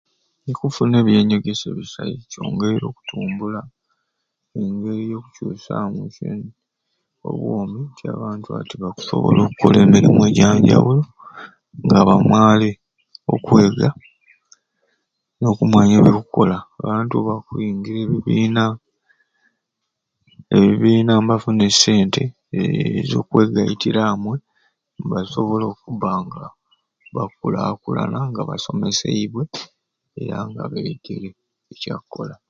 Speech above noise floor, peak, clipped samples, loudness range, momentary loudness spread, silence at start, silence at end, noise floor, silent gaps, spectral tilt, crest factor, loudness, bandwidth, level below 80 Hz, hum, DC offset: 61 dB; 0 dBFS; under 0.1%; 13 LU; 17 LU; 0.45 s; 0.15 s; -78 dBFS; none; -6 dB/octave; 18 dB; -18 LUFS; 7.8 kHz; -50 dBFS; none; under 0.1%